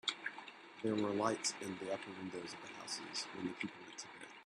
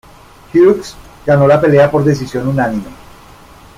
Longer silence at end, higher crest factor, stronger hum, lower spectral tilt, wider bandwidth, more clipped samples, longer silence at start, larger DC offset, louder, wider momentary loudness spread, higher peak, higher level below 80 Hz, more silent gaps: second, 0 s vs 0.85 s; first, 24 dB vs 12 dB; neither; second, -3 dB/octave vs -7.5 dB/octave; second, 13 kHz vs 15 kHz; neither; second, 0.05 s vs 0.55 s; neither; second, -42 LUFS vs -12 LUFS; about the same, 13 LU vs 15 LU; second, -20 dBFS vs 0 dBFS; second, -82 dBFS vs -42 dBFS; neither